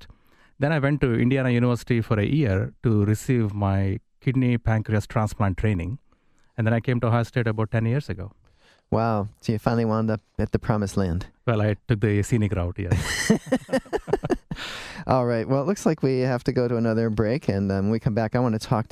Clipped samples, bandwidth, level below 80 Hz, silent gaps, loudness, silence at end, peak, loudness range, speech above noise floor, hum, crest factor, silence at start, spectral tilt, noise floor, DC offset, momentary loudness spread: under 0.1%; 13.5 kHz; -40 dBFS; none; -24 LUFS; 0.1 s; -4 dBFS; 3 LU; 36 dB; none; 20 dB; 0 s; -7 dB/octave; -59 dBFS; under 0.1%; 6 LU